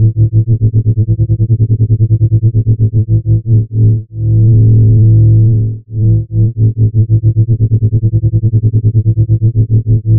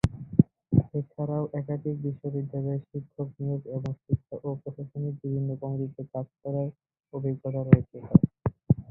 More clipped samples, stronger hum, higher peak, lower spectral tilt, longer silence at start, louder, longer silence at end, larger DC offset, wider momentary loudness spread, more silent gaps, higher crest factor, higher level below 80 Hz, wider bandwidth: neither; neither; about the same, -2 dBFS vs -2 dBFS; first, -19 dB/octave vs -10.5 dB/octave; about the same, 0 s vs 0.05 s; first, -10 LUFS vs -29 LUFS; about the same, 0 s vs 0.05 s; neither; second, 5 LU vs 13 LU; neither; second, 6 dB vs 26 dB; first, -24 dBFS vs -48 dBFS; second, 0.7 kHz vs 6 kHz